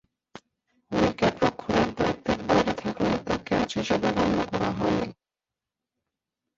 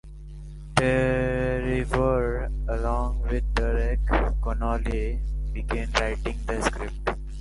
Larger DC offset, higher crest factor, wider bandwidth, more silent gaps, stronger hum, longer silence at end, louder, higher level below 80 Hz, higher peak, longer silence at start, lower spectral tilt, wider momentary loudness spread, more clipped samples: neither; about the same, 20 dB vs 24 dB; second, 7.8 kHz vs 11.5 kHz; neither; neither; first, 1.45 s vs 0 s; about the same, -26 LUFS vs -27 LUFS; second, -48 dBFS vs -28 dBFS; second, -8 dBFS vs -2 dBFS; first, 0.35 s vs 0.05 s; about the same, -6 dB/octave vs -6 dB/octave; second, 5 LU vs 8 LU; neither